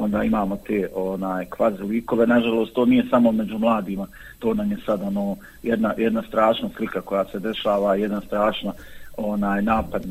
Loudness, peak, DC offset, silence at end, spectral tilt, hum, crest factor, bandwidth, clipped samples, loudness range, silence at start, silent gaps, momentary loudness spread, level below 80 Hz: -22 LUFS; -6 dBFS; under 0.1%; 0 s; -7 dB/octave; none; 16 dB; 15.5 kHz; under 0.1%; 3 LU; 0 s; none; 10 LU; -46 dBFS